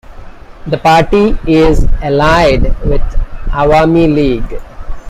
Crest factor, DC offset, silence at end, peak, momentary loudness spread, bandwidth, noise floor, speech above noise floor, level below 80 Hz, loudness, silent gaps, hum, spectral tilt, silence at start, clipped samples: 10 dB; under 0.1%; 0 s; 0 dBFS; 14 LU; 10 kHz; -29 dBFS; 20 dB; -16 dBFS; -11 LUFS; none; none; -7 dB/octave; 0.1 s; under 0.1%